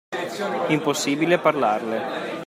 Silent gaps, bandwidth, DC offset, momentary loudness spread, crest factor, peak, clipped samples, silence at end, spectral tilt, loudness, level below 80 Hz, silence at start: none; 16 kHz; under 0.1%; 8 LU; 18 dB; -4 dBFS; under 0.1%; 0 s; -4.5 dB/octave; -22 LUFS; -70 dBFS; 0.1 s